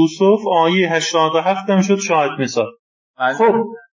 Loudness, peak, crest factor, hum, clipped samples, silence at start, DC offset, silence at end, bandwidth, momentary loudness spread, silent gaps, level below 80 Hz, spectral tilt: -16 LUFS; -2 dBFS; 14 dB; none; under 0.1%; 0 s; under 0.1%; 0.15 s; 7.6 kHz; 7 LU; 2.79-3.14 s; -72 dBFS; -5 dB/octave